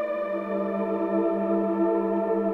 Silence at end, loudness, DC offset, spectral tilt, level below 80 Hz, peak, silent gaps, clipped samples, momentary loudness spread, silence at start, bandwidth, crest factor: 0 s; -26 LUFS; under 0.1%; -10 dB/octave; -64 dBFS; -14 dBFS; none; under 0.1%; 4 LU; 0 s; 4.3 kHz; 12 dB